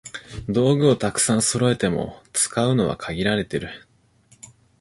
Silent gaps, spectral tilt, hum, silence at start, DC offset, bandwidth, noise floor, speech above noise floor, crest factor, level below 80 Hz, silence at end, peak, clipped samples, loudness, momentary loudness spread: none; -4.5 dB/octave; none; 0.05 s; under 0.1%; 12 kHz; -57 dBFS; 36 dB; 18 dB; -48 dBFS; 1.05 s; -4 dBFS; under 0.1%; -21 LUFS; 13 LU